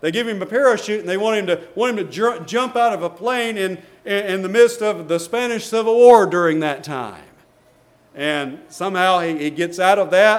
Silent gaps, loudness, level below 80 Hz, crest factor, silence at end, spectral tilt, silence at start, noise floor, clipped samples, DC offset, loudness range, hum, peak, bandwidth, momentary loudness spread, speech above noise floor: none; -18 LUFS; -66 dBFS; 18 dB; 0 s; -4.5 dB/octave; 0.05 s; -54 dBFS; under 0.1%; under 0.1%; 5 LU; none; 0 dBFS; 15 kHz; 11 LU; 36 dB